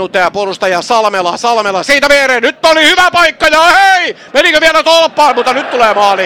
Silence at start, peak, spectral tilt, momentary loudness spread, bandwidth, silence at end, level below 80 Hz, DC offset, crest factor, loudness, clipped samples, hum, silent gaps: 0 s; 0 dBFS; -1.5 dB/octave; 7 LU; 17 kHz; 0 s; -42 dBFS; 0.5%; 8 dB; -8 LUFS; 0.4%; none; none